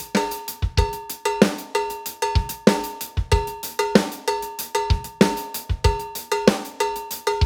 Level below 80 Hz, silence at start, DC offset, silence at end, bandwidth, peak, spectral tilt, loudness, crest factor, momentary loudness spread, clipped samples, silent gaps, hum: -32 dBFS; 0 s; under 0.1%; 0 s; over 20 kHz; 0 dBFS; -5 dB/octave; -23 LUFS; 22 dB; 8 LU; under 0.1%; none; none